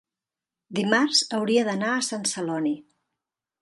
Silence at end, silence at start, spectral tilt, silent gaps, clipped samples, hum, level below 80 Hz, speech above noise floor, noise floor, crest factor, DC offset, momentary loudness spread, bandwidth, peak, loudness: 0.8 s; 0.7 s; -3 dB/octave; none; under 0.1%; none; -76 dBFS; 65 dB; -89 dBFS; 22 dB; under 0.1%; 9 LU; 11.5 kHz; -6 dBFS; -24 LUFS